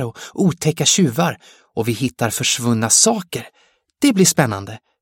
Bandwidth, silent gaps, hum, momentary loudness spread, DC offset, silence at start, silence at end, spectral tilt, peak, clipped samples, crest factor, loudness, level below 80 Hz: 17 kHz; none; none; 16 LU; under 0.1%; 0 s; 0.25 s; -3.5 dB/octave; 0 dBFS; under 0.1%; 18 dB; -16 LUFS; -56 dBFS